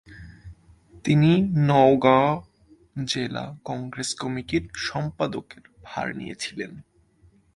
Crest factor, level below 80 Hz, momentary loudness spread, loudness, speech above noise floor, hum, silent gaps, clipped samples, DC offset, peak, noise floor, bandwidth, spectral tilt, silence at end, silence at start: 20 dB; -52 dBFS; 17 LU; -23 LUFS; 36 dB; none; none; under 0.1%; under 0.1%; -4 dBFS; -58 dBFS; 11.5 kHz; -6 dB/octave; 0.75 s; 0.1 s